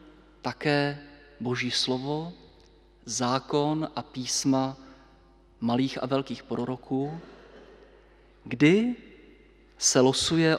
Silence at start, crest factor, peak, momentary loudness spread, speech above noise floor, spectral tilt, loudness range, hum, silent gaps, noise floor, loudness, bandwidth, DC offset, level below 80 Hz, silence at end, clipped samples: 0.45 s; 22 dB; -8 dBFS; 15 LU; 31 dB; -4 dB/octave; 5 LU; none; none; -57 dBFS; -27 LUFS; 14 kHz; under 0.1%; -58 dBFS; 0 s; under 0.1%